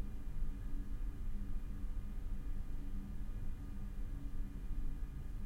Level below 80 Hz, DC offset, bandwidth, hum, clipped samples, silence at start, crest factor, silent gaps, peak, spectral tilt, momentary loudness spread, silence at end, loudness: -40 dBFS; under 0.1%; 3.9 kHz; none; under 0.1%; 0 s; 12 dB; none; -28 dBFS; -7.5 dB/octave; 2 LU; 0 s; -48 LUFS